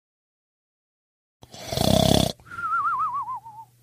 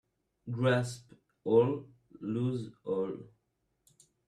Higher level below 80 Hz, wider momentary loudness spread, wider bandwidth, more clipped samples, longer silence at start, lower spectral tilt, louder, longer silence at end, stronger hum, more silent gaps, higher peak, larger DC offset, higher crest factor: first, -42 dBFS vs -70 dBFS; about the same, 15 LU vs 17 LU; first, 16 kHz vs 12.5 kHz; neither; first, 1.55 s vs 0.45 s; second, -5 dB/octave vs -7 dB/octave; first, -23 LUFS vs -32 LUFS; second, 0.2 s vs 1.05 s; neither; neither; first, -4 dBFS vs -14 dBFS; neither; about the same, 24 dB vs 20 dB